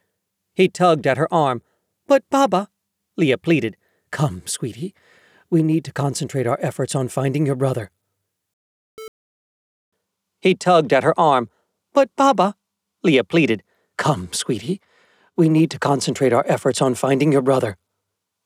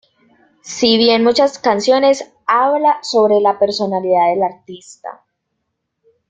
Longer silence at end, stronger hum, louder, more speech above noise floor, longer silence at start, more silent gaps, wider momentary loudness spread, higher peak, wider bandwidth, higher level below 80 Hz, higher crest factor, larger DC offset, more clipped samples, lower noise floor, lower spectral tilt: second, 0.7 s vs 1.15 s; neither; second, -19 LUFS vs -14 LUFS; about the same, 60 dB vs 59 dB; about the same, 0.6 s vs 0.65 s; first, 8.53-8.97 s, 9.08-9.92 s vs none; second, 13 LU vs 20 LU; second, -4 dBFS vs 0 dBFS; first, 15.5 kHz vs 9.2 kHz; second, -64 dBFS vs -58 dBFS; about the same, 16 dB vs 14 dB; neither; neither; first, -78 dBFS vs -73 dBFS; first, -5.5 dB/octave vs -4 dB/octave